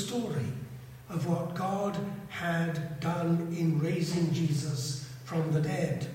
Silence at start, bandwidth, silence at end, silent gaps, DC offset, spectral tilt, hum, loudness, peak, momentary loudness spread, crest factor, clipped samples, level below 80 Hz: 0 s; 16 kHz; 0 s; none; under 0.1%; -6.5 dB/octave; none; -32 LUFS; -18 dBFS; 9 LU; 14 dB; under 0.1%; -62 dBFS